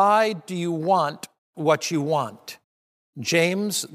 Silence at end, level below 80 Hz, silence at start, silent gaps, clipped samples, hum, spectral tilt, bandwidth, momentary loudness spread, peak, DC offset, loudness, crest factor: 0 s; -76 dBFS; 0 s; 1.38-1.53 s, 2.64-3.13 s; under 0.1%; none; -4 dB/octave; 15.5 kHz; 18 LU; -6 dBFS; under 0.1%; -23 LUFS; 18 dB